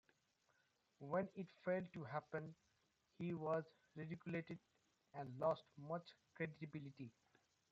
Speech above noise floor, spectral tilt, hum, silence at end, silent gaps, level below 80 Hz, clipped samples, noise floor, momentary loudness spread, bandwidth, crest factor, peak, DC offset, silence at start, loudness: 35 dB; -6.5 dB/octave; none; 0.6 s; none; -86 dBFS; under 0.1%; -83 dBFS; 15 LU; 7.6 kHz; 20 dB; -30 dBFS; under 0.1%; 1 s; -48 LUFS